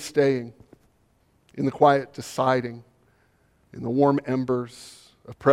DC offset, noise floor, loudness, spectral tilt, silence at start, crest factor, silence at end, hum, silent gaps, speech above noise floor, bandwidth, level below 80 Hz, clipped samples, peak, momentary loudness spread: under 0.1%; -64 dBFS; -24 LUFS; -6.5 dB/octave; 0 s; 20 dB; 0 s; none; none; 41 dB; 15 kHz; -64 dBFS; under 0.1%; -4 dBFS; 23 LU